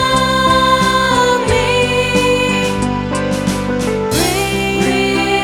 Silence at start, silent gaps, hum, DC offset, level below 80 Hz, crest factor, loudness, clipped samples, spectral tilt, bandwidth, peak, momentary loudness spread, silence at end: 0 s; none; none; under 0.1%; -32 dBFS; 12 dB; -14 LUFS; under 0.1%; -4 dB/octave; 18.5 kHz; -2 dBFS; 6 LU; 0 s